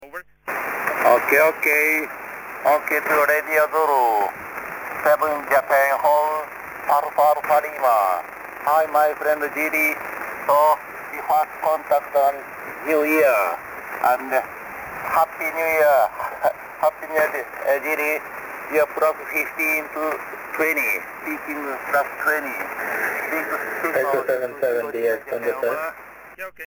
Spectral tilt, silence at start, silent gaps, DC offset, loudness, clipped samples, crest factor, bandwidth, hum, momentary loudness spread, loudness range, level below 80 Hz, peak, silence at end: -3.5 dB/octave; 0 s; none; under 0.1%; -21 LUFS; under 0.1%; 18 dB; 17.5 kHz; none; 13 LU; 4 LU; -62 dBFS; -4 dBFS; 0 s